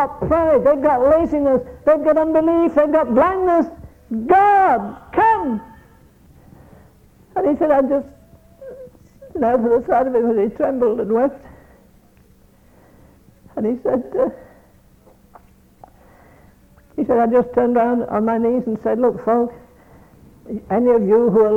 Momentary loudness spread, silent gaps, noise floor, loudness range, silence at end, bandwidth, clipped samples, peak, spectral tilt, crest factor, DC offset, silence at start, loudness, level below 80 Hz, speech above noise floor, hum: 11 LU; none; -51 dBFS; 10 LU; 0 s; 7.4 kHz; under 0.1%; -2 dBFS; -9 dB/octave; 16 dB; under 0.1%; 0 s; -17 LUFS; -46 dBFS; 35 dB; none